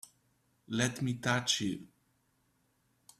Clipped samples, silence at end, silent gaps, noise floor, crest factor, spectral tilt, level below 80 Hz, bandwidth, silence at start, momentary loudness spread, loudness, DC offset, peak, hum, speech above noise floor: under 0.1%; 1.35 s; none; -75 dBFS; 24 dB; -3.5 dB/octave; -70 dBFS; 14.5 kHz; 0.7 s; 9 LU; -33 LUFS; under 0.1%; -14 dBFS; none; 41 dB